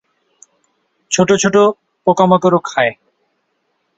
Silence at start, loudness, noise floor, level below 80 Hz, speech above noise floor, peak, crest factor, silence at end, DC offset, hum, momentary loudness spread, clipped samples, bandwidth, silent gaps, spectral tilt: 1.1 s; -14 LUFS; -66 dBFS; -56 dBFS; 54 dB; 0 dBFS; 16 dB; 1.05 s; under 0.1%; none; 7 LU; under 0.1%; 8.4 kHz; none; -4.5 dB/octave